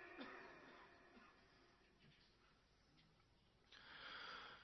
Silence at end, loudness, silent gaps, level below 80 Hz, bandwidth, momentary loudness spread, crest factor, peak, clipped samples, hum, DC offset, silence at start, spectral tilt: 0 s; -59 LUFS; none; -82 dBFS; 6 kHz; 13 LU; 22 dB; -40 dBFS; under 0.1%; none; under 0.1%; 0 s; -0.5 dB/octave